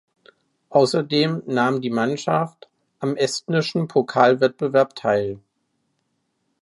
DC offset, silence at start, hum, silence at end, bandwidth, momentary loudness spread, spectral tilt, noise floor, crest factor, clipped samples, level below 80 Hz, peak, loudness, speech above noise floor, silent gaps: under 0.1%; 0.7 s; none; 1.25 s; 11.5 kHz; 8 LU; -5.5 dB/octave; -72 dBFS; 20 dB; under 0.1%; -66 dBFS; -2 dBFS; -21 LUFS; 52 dB; none